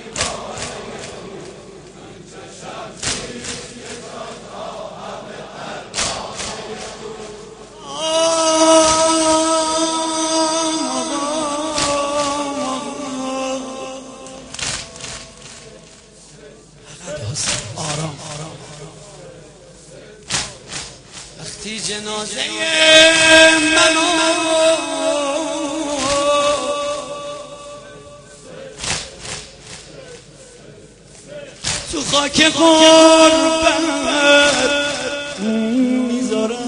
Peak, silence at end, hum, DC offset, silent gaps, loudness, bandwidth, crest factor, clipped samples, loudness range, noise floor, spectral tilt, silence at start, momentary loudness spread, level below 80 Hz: 0 dBFS; 0 s; none; under 0.1%; none; -15 LUFS; 10.5 kHz; 18 dB; under 0.1%; 17 LU; -43 dBFS; -2 dB/octave; 0 s; 24 LU; -48 dBFS